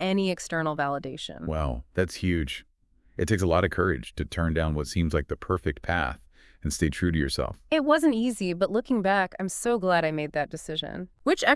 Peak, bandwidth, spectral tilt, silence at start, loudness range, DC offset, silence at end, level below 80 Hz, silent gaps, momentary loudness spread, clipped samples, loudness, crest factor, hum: -4 dBFS; 12 kHz; -5.5 dB/octave; 0 s; 3 LU; under 0.1%; 0 s; -42 dBFS; none; 9 LU; under 0.1%; -27 LUFS; 22 dB; none